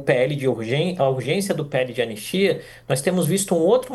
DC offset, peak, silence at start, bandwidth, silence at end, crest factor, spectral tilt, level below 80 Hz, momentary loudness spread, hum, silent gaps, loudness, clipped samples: under 0.1%; -4 dBFS; 0 s; 13 kHz; 0 s; 18 dB; -5 dB/octave; -58 dBFS; 6 LU; none; none; -22 LUFS; under 0.1%